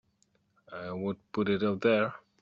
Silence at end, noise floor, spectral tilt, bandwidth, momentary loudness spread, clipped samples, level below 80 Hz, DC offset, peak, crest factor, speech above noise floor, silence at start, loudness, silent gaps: 0.2 s; -72 dBFS; -5 dB/octave; 7.4 kHz; 14 LU; under 0.1%; -70 dBFS; under 0.1%; -14 dBFS; 18 dB; 42 dB; 0.7 s; -30 LUFS; none